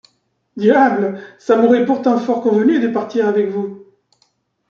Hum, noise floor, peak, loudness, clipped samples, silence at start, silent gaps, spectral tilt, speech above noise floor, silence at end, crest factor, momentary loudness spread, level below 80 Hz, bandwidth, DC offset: none; -64 dBFS; -2 dBFS; -15 LUFS; under 0.1%; 0.55 s; none; -7.5 dB/octave; 50 dB; 0.9 s; 14 dB; 11 LU; -64 dBFS; 7.2 kHz; under 0.1%